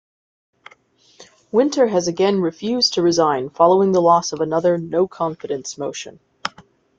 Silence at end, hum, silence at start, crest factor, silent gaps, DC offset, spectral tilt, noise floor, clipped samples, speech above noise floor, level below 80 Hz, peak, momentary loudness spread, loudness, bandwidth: 0.5 s; none; 1.2 s; 18 dB; none; under 0.1%; -4.5 dB/octave; -54 dBFS; under 0.1%; 36 dB; -62 dBFS; -2 dBFS; 15 LU; -18 LUFS; 7.8 kHz